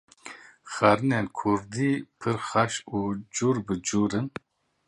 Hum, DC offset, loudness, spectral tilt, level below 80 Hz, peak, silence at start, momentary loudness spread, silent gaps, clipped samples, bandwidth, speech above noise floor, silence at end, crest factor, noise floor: none; under 0.1%; -27 LUFS; -5 dB/octave; -58 dBFS; -4 dBFS; 0.25 s; 19 LU; none; under 0.1%; 11 kHz; 21 dB; 0.6 s; 24 dB; -47 dBFS